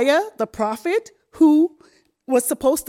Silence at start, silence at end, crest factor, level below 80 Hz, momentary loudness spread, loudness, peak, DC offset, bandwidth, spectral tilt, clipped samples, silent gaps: 0 s; 0.05 s; 16 dB; -56 dBFS; 9 LU; -20 LUFS; -4 dBFS; under 0.1%; 16.5 kHz; -3.5 dB/octave; under 0.1%; none